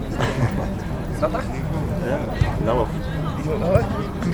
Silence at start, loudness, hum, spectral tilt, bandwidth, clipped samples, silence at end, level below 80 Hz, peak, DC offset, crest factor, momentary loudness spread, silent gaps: 0 s; -23 LUFS; none; -7.5 dB/octave; over 20 kHz; under 0.1%; 0 s; -30 dBFS; -4 dBFS; under 0.1%; 18 dB; 6 LU; none